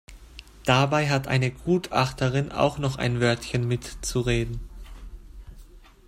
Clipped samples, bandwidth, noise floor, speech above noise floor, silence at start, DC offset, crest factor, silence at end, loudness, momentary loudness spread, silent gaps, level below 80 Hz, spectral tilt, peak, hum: under 0.1%; 15.5 kHz; -48 dBFS; 24 dB; 0.1 s; under 0.1%; 20 dB; 0.3 s; -25 LUFS; 23 LU; none; -42 dBFS; -5.5 dB/octave; -6 dBFS; none